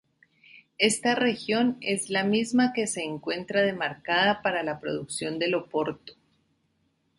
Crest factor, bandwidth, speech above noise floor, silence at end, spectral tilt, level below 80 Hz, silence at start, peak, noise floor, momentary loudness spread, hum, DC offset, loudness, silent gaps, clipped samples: 22 dB; 11.5 kHz; 45 dB; 1.05 s; -3.5 dB/octave; -66 dBFS; 0.55 s; -6 dBFS; -72 dBFS; 8 LU; none; under 0.1%; -26 LUFS; none; under 0.1%